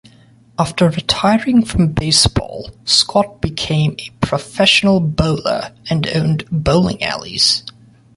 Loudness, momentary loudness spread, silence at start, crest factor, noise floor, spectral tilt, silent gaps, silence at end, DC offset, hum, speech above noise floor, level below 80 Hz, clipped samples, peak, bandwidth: -15 LUFS; 10 LU; 0.6 s; 16 dB; -47 dBFS; -4.5 dB/octave; none; 0.45 s; under 0.1%; none; 31 dB; -34 dBFS; under 0.1%; 0 dBFS; 11.5 kHz